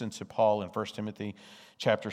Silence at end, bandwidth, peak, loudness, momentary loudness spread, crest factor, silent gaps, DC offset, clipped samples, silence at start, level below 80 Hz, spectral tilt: 0 s; 14 kHz; -12 dBFS; -31 LUFS; 16 LU; 20 dB; none; under 0.1%; under 0.1%; 0 s; -76 dBFS; -5.5 dB/octave